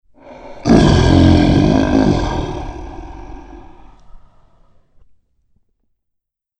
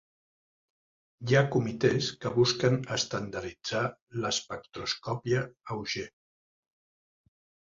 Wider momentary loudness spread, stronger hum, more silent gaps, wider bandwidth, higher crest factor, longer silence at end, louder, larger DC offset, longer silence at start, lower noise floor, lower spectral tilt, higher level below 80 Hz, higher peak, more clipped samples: first, 24 LU vs 12 LU; neither; second, none vs 4.02-4.07 s; first, 9.2 kHz vs 7.6 kHz; second, 16 dB vs 22 dB; first, 2.4 s vs 1.65 s; first, -13 LUFS vs -30 LUFS; neither; second, 0.3 s vs 1.2 s; second, -76 dBFS vs under -90 dBFS; first, -7 dB/octave vs -4.5 dB/octave; first, -26 dBFS vs -62 dBFS; first, 0 dBFS vs -8 dBFS; neither